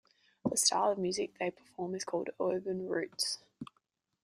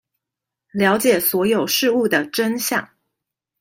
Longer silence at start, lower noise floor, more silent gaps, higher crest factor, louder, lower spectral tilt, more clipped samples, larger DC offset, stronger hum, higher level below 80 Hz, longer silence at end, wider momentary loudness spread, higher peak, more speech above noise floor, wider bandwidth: second, 0.45 s vs 0.75 s; second, -79 dBFS vs -85 dBFS; neither; about the same, 22 dB vs 18 dB; second, -34 LUFS vs -18 LUFS; about the same, -2.5 dB/octave vs -3.5 dB/octave; neither; neither; neither; second, -76 dBFS vs -64 dBFS; second, 0.6 s vs 0.75 s; first, 14 LU vs 6 LU; second, -14 dBFS vs -2 dBFS; second, 44 dB vs 66 dB; about the same, 15.5 kHz vs 16.5 kHz